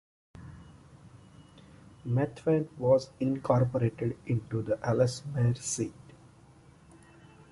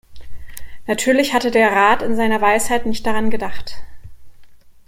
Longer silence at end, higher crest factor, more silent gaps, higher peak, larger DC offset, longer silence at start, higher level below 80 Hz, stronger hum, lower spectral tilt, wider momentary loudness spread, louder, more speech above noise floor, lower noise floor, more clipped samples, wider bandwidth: first, 1.6 s vs 0.15 s; first, 20 dB vs 14 dB; neither; second, -12 dBFS vs -2 dBFS; neither; first, 0.35 s vs 0.1 s; second, -58 dBFS vs -40 dBFS; neither; first, -6.5 dB/octave vs -3.5 dB/octave; second, 14 LU vs 21 LU; second, -30 LUFS vs -17 LUFS; about the same, 28 dB vs 26 dB; first, -57 dBFS vs -41 dBFS; neither; second, 11.5 kHz vs 16.5 kHz